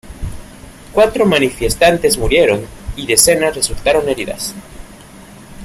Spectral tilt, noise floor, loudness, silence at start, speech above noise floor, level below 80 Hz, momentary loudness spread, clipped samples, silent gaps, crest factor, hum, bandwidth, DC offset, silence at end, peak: -3 dB/octave; -37 dBFS; -13 LUFS; 0.05 s; 24 dB; -32 dBFS; 19 LU; under 0.1%; none; 16 dB; none; 16 kHz; under 0.1%; 0 s; 0 dBFS